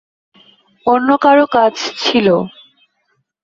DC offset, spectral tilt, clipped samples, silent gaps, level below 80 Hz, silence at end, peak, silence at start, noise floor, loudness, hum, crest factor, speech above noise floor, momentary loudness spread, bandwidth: under 0.1%; -5 dB/octave; under 0.1%; none; -58 dBFS; 0.95 s; 0 dBFS; 0.85 s; -65 dBFS; -13 LUFS; none; 14 dB; 53 dB; 8 LU; 7.6 kHz